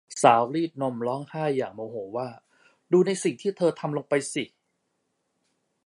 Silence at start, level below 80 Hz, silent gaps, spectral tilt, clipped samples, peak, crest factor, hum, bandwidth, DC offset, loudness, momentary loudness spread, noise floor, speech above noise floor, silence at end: 0.1 s; -76 dBFS; none; -5 dB/octave; under 0.1%; -2 dBFS; 24 dB; none; 11.5 kHz; under 0.1%; -26 LUFS; 14 LU; -76 dBFS; 51 dB; 1.4 s